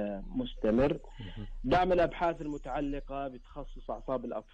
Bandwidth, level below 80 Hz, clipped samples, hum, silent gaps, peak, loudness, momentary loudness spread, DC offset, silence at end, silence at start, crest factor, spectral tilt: 8.6 kHz; -44 dBFS; under 0.1%; none; none; -18 dBFS; -32 LUFS; 17 LU; under 0.1%; 0.1 s; 0 s; 14 dB; -7.5 dB/octave